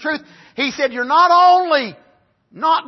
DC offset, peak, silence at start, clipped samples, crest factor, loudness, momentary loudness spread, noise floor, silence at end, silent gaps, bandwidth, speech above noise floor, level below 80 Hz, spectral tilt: under 0.1%; -2 dBFS; 0 s; under 0.1%; 14 dB; -15 LUFS; 16 LU; -56 dBFS; 0 s; none; 6.2 kHz; 41 dB; -68 dBFS; -3 dB/octave